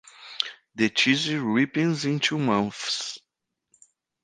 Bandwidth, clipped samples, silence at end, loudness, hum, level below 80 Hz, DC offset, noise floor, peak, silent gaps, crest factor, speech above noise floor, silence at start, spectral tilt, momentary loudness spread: 10 kHz; under 0.1%; 1.05 s; -25 LUFS; none; -68 dBFS; under 0.1%; -81 dBFS; -2 dBFS; none; 24 dB; 56 dB; 0.2 s; -4 dB/octave; 9 LU